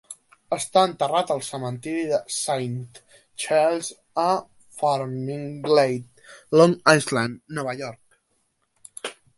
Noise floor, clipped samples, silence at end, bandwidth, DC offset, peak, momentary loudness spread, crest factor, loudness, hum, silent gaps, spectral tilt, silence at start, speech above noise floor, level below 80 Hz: -70 dBFS; under 0.1%; 0.25 s; 12 kHz; under 0.1%; 0 dBFS; 17 LU; 24 dB; -23 LUFS; none; none; -4.5 dB/octave; 0.1 s; 48 dB; -68 dBFS